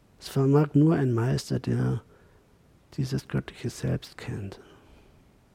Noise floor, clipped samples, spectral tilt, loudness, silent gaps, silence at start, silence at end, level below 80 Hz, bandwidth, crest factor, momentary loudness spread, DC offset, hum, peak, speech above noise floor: -59 dBFS; under 0.1%; -7.5 dB/octave; -27 LUFS; none; 0.2 s; 1 s; -54 dBFS; 15.5 kHz; 18 dB; 15 LU; under 0.1%; none; -8 dBFS; 33 dB